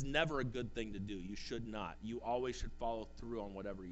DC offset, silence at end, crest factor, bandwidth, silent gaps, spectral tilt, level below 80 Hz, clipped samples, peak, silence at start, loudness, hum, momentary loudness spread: under 0.1%; 0 s; 20 dB; 8.2 kHz; none; -5.5 dB/octave; -52 dBFS; under 0.1%; -20 dBFS; 0 s; -42 LUFS; none; 8 LU